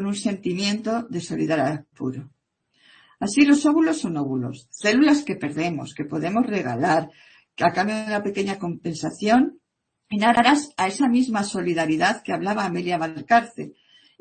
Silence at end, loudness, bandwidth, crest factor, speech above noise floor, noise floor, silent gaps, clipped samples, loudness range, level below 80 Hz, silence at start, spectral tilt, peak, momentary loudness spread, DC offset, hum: 0.5 s; -22 LUFS; 8.8 kHz; 20 dB; 49 dB; -71 dBFS; none; under 0.1%; 3 LU; -62 dBFS; 0 s; -5 dB/octave; -2 dBFS; 13 LU; under 0.1%; none